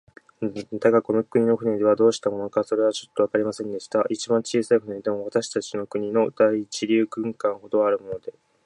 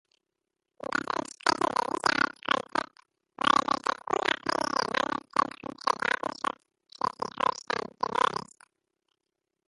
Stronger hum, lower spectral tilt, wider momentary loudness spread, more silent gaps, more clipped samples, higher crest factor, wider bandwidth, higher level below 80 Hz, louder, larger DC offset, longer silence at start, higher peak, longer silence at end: neither; first, -5 dB/octave vs -2.5 dB/octave; about the same, 9 LU vs 8 LU; neither; neither; second, 18 dB vs 24 dB; about the same, 11 kHz vs 11.5 kHz; about the same, -68 dBFS vs -68 dBFS; first, -23 LUFS vs -29 LUFS; neither; second, 0.4 s vs 0.85 s; about the same, -6 dBFS vs -6 dBFS; second, 0.35 s vs 1.25 s